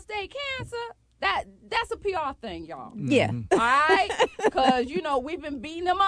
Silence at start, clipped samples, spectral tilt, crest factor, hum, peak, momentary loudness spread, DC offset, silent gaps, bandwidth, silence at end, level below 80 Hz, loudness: 0.1 s; under 0.1%; -4.5 dB/octave; 20 dB; none; -6 dBFS; 15 LU; under 0.1%; none; 11 kHz; 0 s; -52 dBFS; -25 LUFS